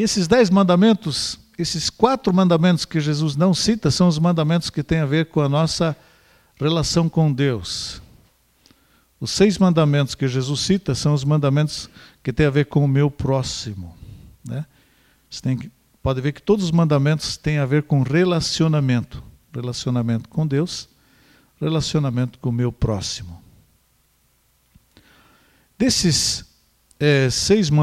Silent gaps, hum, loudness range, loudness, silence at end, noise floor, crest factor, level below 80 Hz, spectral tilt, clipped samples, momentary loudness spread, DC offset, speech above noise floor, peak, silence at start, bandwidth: none; none; 7 LU; -19 LUFS; 0 s; -62 dBFS; 20 dB; -44 dBFS; -5.5 dB/octave; under 0.1%; 15 LU; under 0.1%; 43 dB; 0 dBFS; 0 s; 13.5 kHz